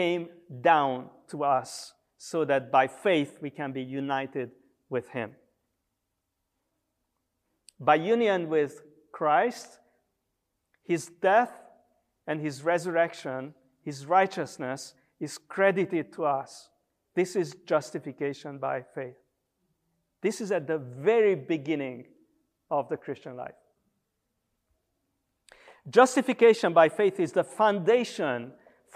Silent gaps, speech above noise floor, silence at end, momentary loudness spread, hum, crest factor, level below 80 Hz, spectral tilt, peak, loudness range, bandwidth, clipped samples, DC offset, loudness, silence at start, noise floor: none; 55 dB; 0.45 s; 18 LU; none; 22 dB; -82 dBFS; -5 dB/octave; -6 dBFS; 12 LU; 14.5 kHz; under 0.1%; under 0.1%; -27 LUFS; 0 s; -82 dBFS